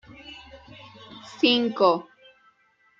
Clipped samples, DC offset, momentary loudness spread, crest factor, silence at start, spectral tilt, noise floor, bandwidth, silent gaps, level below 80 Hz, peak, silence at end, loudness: under 0.1%; under 0.1%; 25 LU; 22 dB; 0.25 s; -5 dB/octave; -64 dBFS; 7.6 kHz; none; -64 dBFS; -6 dBFS; 1 s; -22 LUFS